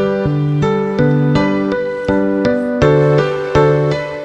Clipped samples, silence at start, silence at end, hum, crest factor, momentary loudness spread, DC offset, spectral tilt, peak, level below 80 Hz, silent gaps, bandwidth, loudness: under 0.1%; 0 s; 0 s; none; 14 dB; 5 LU; under 0.1%; -8 dB/octave; 0 dBFS; -36 dBFS; none; 8 kHz; -14 LUFS